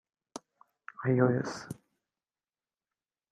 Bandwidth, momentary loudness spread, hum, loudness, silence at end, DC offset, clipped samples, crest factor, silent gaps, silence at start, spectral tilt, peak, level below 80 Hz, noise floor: 12 kHz; 22 LU; none; -30 LUFS; 1.6 s; under 0.1%; under 0.1%; 22 dB; none; 0.35 s; -7.5 dB/octave; -12 dBFS; -72 dBFS; under -90 dBFS